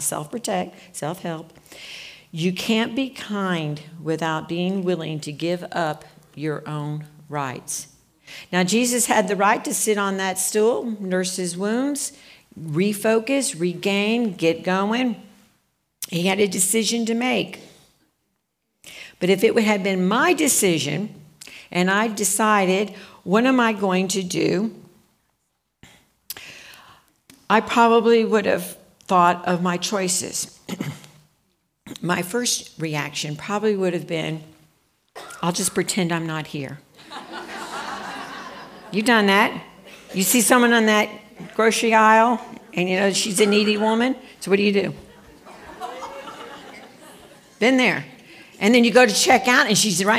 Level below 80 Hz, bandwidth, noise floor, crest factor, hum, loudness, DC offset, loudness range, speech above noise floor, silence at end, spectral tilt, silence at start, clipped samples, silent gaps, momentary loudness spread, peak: -66 dBFS; 16 kHz; -74 dBFS; 20 dB; none; -20 LUFS; under 0.1%; 8 LU; 54 dB; 0 s; -3.5 dB/octave; 0 s; under 0.1%; none; 20 LU; -2 dBFS